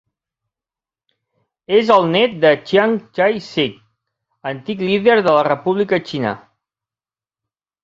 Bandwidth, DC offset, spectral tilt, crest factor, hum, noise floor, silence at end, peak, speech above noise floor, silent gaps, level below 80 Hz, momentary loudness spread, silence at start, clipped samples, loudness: 7.6 kHz; under 0.1%; -6.5 dB/octave; 18 dB; none; under -90 dBFS; 1.45 s; 0 dBFS; over 74 dB; none; -60 dBFS; 12 LU; 1.7 s; under 0.1%; -16 LUFS